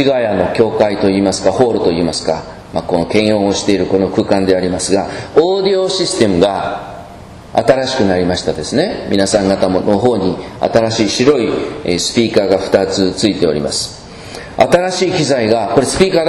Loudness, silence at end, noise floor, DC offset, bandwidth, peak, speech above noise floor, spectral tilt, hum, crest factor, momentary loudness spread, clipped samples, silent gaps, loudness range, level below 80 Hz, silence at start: -14 LUFS; 0 s; -33 dBFS; under 0.1%; 13.5 kHz; 0 dBFS; 20 dB; -4.5 dB/octave; none; 14 dB; 7 LU; 0.2%; none; 1 LU; -40 dBFS; 0 s